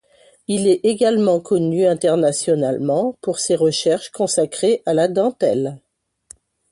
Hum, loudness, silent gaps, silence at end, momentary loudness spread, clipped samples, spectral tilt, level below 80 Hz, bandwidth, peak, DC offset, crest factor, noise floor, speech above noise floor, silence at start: none; -18 LUFS; none; 0.95 s; 5 LU; under 0.1%; -5 dB/octave; -62 dBFS; 11.5 kHz; -4 dBFS; under 0.1%; 14 dB; -48 dBFS; 31 dB; 0.5 s